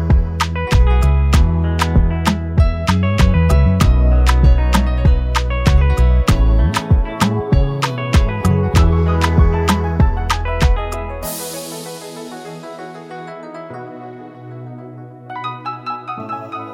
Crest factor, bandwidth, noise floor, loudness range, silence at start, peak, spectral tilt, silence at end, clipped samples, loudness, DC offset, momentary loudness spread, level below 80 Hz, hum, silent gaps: 14 dB; 16 kHz; -34 dBFS; 16 LU; 0 s; -2 dBFS; -6 dB/octave; 0 s; under 0.1%; -16 LUFS; under 0.1%; 18 LU; -18 dBFS; none; none